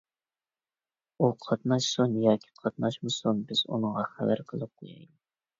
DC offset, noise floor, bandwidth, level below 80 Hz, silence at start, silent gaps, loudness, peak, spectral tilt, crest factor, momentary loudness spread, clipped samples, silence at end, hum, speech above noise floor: under 0.1%; under -90 dBFS; 7.8 kHz; -70 dBFS; 1.2 s; none; -29 LUFS; -10 dBFS; -5.5 dB/octave; 20 dB; 13 LU; under 0.1%; 0.55 s; none; over 61 dB